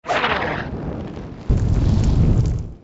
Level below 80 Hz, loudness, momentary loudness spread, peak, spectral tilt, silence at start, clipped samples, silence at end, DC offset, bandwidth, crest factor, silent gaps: -24 dBFS; -20 LUFS; 13 LU; -6 dBFS; -7 dB/octave; 0.05 s; under 0.1%; 0.05 s; under 0.1%; 8 kHz; 14 dB; none